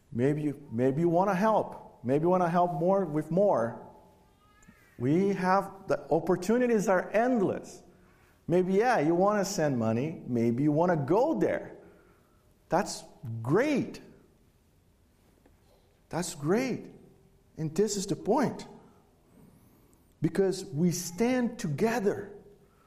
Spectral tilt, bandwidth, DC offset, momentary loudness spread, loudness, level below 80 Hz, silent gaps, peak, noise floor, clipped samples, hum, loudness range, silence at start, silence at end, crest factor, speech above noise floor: -6.5 dB/octave; 15 kHz; under 0.1%; 13 LU; -28 LUFS; -64 dBFS; none; -12 dBFS; -64 dBFS; under 0.1%; none; 7 LU; 0.1 s; 0.5 s; 18 dB; 37 dB